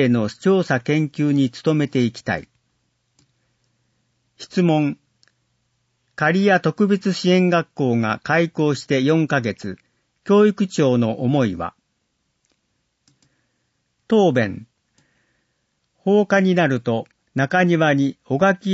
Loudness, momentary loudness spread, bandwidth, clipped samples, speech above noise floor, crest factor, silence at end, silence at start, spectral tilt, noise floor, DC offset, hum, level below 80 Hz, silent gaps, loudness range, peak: -19 LUFS; 11 LU; 8 kHz; under 0.1%; 53 dB; 16 dB; 0 s; 0 s; -6.5 dB/octave; -71 dBFS; under 0.1%; none; -62 dBFS; none; 7 LU; -4 dBFS